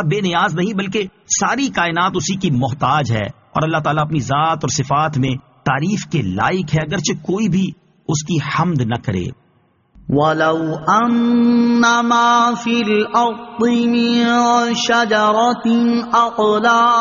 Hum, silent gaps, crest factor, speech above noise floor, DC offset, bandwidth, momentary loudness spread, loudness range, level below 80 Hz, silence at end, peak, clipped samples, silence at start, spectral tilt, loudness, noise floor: none; none; 14 dB; 42 dB; under 0.1%; 7.4 kHz; 7 LU; 5 LU; -48 dBFS; 0 s; -2 dBFS; under 0.1%; 0 s; -4.5 dB/octave; -16 LUFS; -57 dBFS